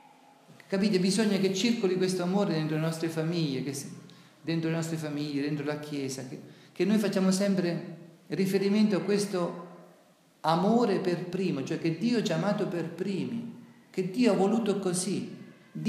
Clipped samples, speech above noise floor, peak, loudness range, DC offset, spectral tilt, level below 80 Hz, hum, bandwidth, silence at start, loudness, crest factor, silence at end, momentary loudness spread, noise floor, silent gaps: under 0.1%; 33 dB; -10 dBFS; 4 LU; under 0.1%; -5.5 dB/octave; -82 dBFS; none; 15 kHz; 0.5 s; -29 LUFS; 18 dB; 0 s; 13 LU; -61 dBFS; none